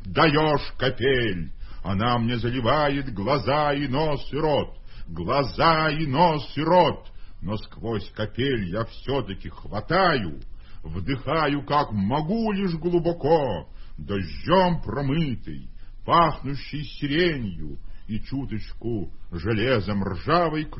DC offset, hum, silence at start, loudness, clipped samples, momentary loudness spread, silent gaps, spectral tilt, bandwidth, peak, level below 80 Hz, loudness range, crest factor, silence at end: under 0.1%; none; 0 s; -24 LUFS; under 0.1%; 15 LU; none; -10.5 dB/octave; 5.8 kHz; -4 dBFS; -40 dBFS; 4 LU; 20 dB; 0 s